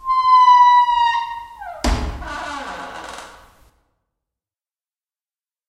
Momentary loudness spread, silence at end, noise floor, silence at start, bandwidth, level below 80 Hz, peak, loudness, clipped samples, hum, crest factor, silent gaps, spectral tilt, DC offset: 23 LU; 2.4 s; under -90 dBFS; 0.05 s; 12 kHz; -34 dBFS; -4 dBFS; -14 LUFS; under 0.1%; none; 16 dB; none; -3.5 dB/octave; under 0.1%